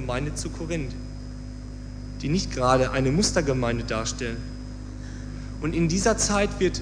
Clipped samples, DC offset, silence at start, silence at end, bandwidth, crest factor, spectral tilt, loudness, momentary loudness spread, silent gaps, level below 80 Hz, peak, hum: under 0.1%; under 0.1%; 0 s; 0 s; 10.5 kHz; 20 dB; -4.5 dB/octave; -25 LUFS; 16 LU; none; -36 dBFS; -6 dBFS; 50 Hz at -35 dBFS